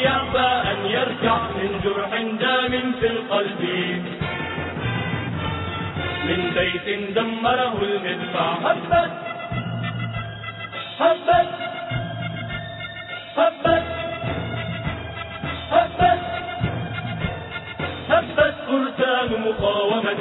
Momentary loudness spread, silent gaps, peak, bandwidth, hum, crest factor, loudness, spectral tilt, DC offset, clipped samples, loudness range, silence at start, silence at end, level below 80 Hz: 10 LU; none; -4 dBFS; 4.1 kHz; none; 18 dB; -23 LUFS; -9 dB/octave; under 0.1%; under 0.1%; 3 LU; 0 s; 0 s; -44 dBFS